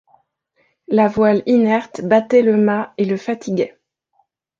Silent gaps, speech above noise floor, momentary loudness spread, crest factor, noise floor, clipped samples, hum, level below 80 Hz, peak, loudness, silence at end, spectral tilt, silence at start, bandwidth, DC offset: none; 49 dB; 9 LU; 16 dB; -64 dBFS; under 0.1%; none; -58 dBFS; -2 dBFS; -17 LUFS; 0.9 s; -7.5 dB/octave; 0.9 s; 7.4 kHz; under 0.1%